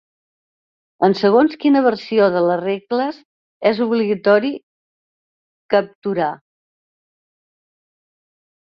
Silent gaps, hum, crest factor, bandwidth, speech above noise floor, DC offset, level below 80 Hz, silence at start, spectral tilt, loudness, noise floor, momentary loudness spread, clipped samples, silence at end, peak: 3.25-3.60 s, 4.63-5.69 s, 5.95-6.02 s; none; 18 dB; 6.8 kHz; over 74 dB; under 0.1%; -66 dBFS; 1 s; -7.5 dB/octave; -17 LUFS; under -90 dBFS; 9 LU; under 0.1%; 2.3 s; -2 dBFS